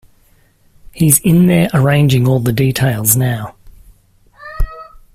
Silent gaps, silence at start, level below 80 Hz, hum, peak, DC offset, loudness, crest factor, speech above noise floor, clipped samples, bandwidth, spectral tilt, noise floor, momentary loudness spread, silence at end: none; 0.95 s; -30 dBFS; none; 0 dBFS; under 0.1%; -12 LUFS; 14 dB; 40 dB; under 0.1%; 16 kHz; -5.5 dB/octave; -51 dBFS; 16 LU; 0.3 s